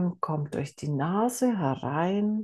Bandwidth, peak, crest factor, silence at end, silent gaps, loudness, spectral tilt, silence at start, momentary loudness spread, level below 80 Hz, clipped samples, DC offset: 12.5 kHz; -12 dBFS; 16 dB; 0 s; none; -28 LUFS; -6.5 dB/octave; 0 s; 6 LU; -68 dBFS; under 0.1%; under 0.1%